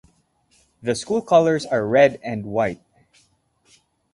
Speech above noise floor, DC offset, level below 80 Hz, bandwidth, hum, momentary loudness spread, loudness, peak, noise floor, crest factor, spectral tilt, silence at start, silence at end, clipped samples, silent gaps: 44 dB; under 0.1%; -58 dBFS; 11.5 kHz; none; 13 LU; -20 LUFS; -2 dBFS; -63 dBFS; 20 dB; -5.5 dB/octave; 0.85 s; 1.4 s; under 0.1%; none